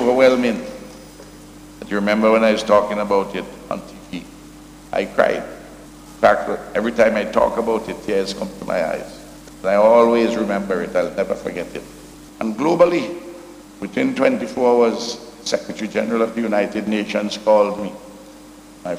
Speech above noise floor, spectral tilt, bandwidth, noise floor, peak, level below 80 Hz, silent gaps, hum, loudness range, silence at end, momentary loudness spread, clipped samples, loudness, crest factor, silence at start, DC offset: 23 dB; -5 dB/octave; 15.5 kHz; -41 dBFS; -2 dBFS; -50 dBFS; none; none; 3 LU; 0 s; 21 LU; under 0.1%; -19 LUFS; 18 dB; 0 s; under 0.1%